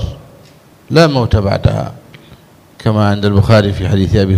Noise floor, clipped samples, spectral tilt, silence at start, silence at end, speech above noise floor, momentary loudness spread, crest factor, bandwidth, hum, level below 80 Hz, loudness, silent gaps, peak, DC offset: -42 dBFS; 0.2%; -7 dB/octave; 0 s; 0 s; 32 dB; 10 LU; 12 dB; 12 kHz; none; -30 dBFS; -12 LUFS; none; 0 dBFS; under 0.1%